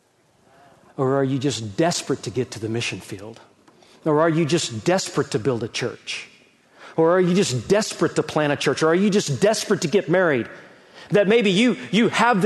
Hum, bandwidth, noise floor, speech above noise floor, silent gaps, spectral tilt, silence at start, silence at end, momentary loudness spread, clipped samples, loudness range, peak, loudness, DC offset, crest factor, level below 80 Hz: none; 12.5 kHz; -59 dBFS; 39 dB; none; -5 dB/octave; 1 s; 0 s; 11 LU; under 0.1%; 5 LU; -4 dBFS; -21 LUFS; under 0.1%; 16 dB; -62 dBFS